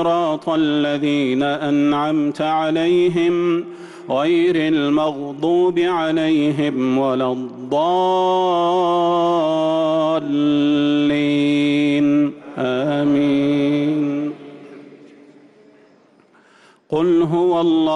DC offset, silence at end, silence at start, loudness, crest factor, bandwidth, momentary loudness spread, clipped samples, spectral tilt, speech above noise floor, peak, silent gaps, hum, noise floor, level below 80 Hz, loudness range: under 0.1%; 0 s; 0 s; -18 LUFS; 8 dB; 9.4 kHz; 6 LU; under 0.1%; -7 dB/octave; 35 dB; -8 dBFS; none; none; -52 dBFS; -60 dBFS; 5 LU